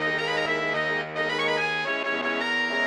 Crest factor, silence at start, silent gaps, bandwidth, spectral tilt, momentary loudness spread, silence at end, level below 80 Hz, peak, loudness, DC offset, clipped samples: 14 dB; 0 s; none; 13 kHz; -3.5 dB/octave; 2 LU; 0 s; -66 dBFS; -12 dBFS; -25 LUFS; under 0.1%; under 0.1%